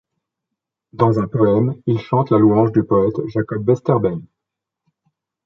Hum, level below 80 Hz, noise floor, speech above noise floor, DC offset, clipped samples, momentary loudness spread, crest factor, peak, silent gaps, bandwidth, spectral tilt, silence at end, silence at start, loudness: none; -50 dBFS; -83 dBFS; 66 dB; under 0.1%; under 0.1%; 8 LU; 16 dB; -2 dBFS; none; 6.4 kHz; -10.5 dB/octave; 1.25 s; 0.95 s; -17 LUFS